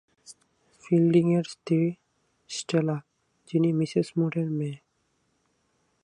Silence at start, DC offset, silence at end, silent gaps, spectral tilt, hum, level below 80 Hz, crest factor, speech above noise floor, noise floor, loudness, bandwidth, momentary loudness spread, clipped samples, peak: 0.3 s; under 0.1%; 1.25 s; none; -7 dB/octave; none; -72 dBFS; 18 dB; 48 dB; -72 dBFS; -26 LUFS; 10.5 kHz; 14 LU; under 0.1%; -10 dBFS